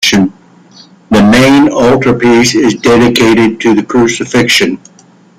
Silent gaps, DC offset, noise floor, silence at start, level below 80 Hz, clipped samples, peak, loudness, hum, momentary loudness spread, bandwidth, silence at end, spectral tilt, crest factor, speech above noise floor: none; under 0.1%; -38 dBFS; 0 s; -38 dBFS; under 0.1%; 0 dBFS; -8 LUFS; none; 6 LU; 16 kHz; 0.65 s; -4.5 dB/octave; 8 dB; 31 dB